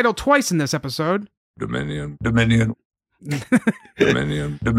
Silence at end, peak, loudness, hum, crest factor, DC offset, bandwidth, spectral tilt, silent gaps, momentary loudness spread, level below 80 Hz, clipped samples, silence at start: 0 s; -2 dBFS; -21 LUFS; none; 18 dB; under 0.1%; 15.5 kHz; -5.5 dB/octave; 1.37-1.54 s, 2.85-2.90 s; 11 LU; -42 dBFS; under 0.1%; 0 s